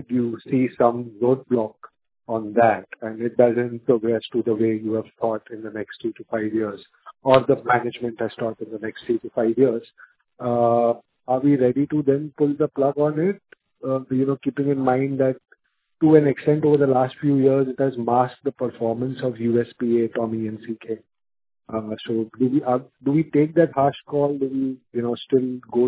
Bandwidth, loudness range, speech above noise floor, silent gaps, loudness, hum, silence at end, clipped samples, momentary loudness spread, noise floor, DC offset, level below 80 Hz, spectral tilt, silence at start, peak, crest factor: 4 kHz; 6 LU; 40 dB; none; -22 LUFS; none; 0 s; under 0.1%; 12 LU; -61 dBFS; under 0.1%; -62 dBFS; -11.5 dB/octave; 0 s; 0 dBFS; 22 dB